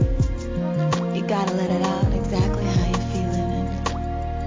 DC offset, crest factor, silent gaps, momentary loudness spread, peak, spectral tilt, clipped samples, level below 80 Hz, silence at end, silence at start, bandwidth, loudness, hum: 0.1%; 14 dB; none; 5 LU; -8 dBFS; -7 dB/octave; under 0.1%; -28 dBFS; 0 s; 0 s; 7.6 kHz; -23 LUFS; none